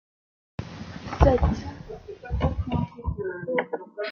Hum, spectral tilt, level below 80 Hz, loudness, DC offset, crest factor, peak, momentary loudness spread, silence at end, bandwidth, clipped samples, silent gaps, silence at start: none; -8 dB/octave; -32 dBFS; -27 LUFS; under 0.1%; 24 dB; -2 dBFS; 19 LU; 0 s; 6.8 kHz; under 0.1%; none; 0.6 s